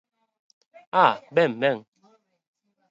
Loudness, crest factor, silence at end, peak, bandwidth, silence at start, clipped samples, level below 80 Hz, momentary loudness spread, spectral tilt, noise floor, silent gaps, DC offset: -23 LUFS; 24 dB; 1.1 s; -2 dBFS; 7.8 kHz; 0.95 s; under 0.1%; -78 dBFS; 6 LU; -6.5 dB/octave; -63 dBFS; none; under 0.1%